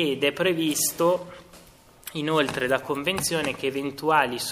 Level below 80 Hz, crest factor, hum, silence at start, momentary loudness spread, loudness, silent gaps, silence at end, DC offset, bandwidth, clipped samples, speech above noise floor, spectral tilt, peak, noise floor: -60 dBFS; 20 dB; none; 0 s; 8 LU; -24 LUFS; none; 0 s; under 0.1%; 15.5 kHz; under 0.1%; 27 dB; -3 dB/octave; -6 dBFS; -52 dBFS